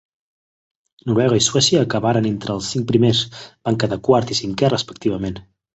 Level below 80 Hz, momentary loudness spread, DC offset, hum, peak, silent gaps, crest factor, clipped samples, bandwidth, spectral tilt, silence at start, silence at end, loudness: -48 dBFS; 12 LU; under 0.1%; none; -2 dBFS; none; 18 dB; under 0.1%; 8.2 kHz; -4.5 dB/octave; 1.05 s; 0.35 s; -18 LUFS